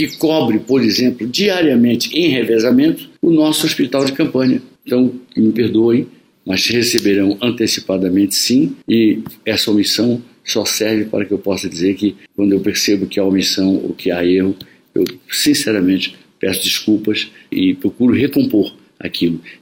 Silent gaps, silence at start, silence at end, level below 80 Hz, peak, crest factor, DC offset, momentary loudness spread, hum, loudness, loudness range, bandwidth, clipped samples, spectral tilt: none; 0 s; 0.05 s; -54 dBFS; 0 dBFS; 16 dB; under 0.1%; 7 LU; none; -15 LUFS; 3 LU; 17 kHz; under 0.1%; -4 dB/octave